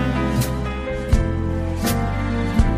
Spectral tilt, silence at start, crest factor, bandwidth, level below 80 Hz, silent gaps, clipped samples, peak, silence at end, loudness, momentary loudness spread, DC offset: -6.5 dB/octave; 0 s; 16 dB; 16 kHz; -24 dBFS; none; under 0.1%; -4 dBFS; 0 s; -22 LUFS; 4 LU; under 0.1%